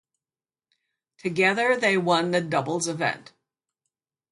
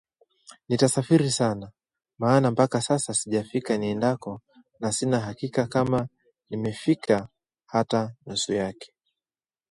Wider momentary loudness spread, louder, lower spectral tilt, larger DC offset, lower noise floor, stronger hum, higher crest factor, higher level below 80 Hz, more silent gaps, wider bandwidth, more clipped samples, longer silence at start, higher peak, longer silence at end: second, 9 LU vs 12 LU; about the same, -23 LUFS vs -25 LUFS; about the same, -4 dB/octave vs -5 dB/octave; neither; about the same, under -90 dBFS vs under -90 dBFS; neither; about the same, 20 dB vs 20 dB; second, -72 dBFS vs -60 dBFS; neither; about the same, 11.5 kHz vs 11.5 kHz; neither; first, 1.25 s vs 0.7 s; about the same, -6 dBFS vs -6 dBFS; first, 1.1 s vs 0.85 s